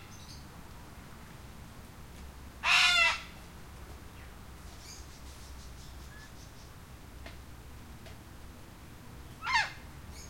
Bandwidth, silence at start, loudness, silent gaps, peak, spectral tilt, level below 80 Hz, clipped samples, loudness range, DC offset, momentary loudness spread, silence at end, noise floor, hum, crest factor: 16.5 kHz; 0 s; -27 LUFS; none; -12 dBFS; -1.5 dB/octave; -52 dBFS; under 0.1%; 20 LU; 0.1%; 25 LU; 0 s; -50 dBFS; none; 26 dB